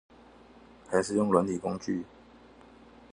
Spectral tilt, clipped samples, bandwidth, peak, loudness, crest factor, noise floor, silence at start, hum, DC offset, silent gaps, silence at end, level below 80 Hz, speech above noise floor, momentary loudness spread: -6 dB/octave; under 0.1%; 11 kHz; -8 dBFS; -29 LUFS; 24 dB; -55 dBFS; 0.9 s; none; under 0.1%; none; 1.1 s; -62 dBFS; 27 dB; 10 LU